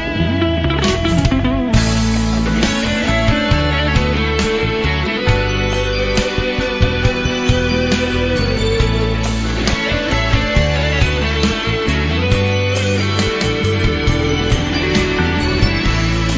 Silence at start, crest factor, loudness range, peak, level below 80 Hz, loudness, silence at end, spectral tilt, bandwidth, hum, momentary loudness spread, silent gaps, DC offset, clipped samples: 0 s; 14 dB; 1 LU; 0 dBFS; -22 dBFS; -16 LUFS; 0 s; -5.5 dB/octave; 8 kHz; none; 2 LU; none; under 0.1%; under 0.1%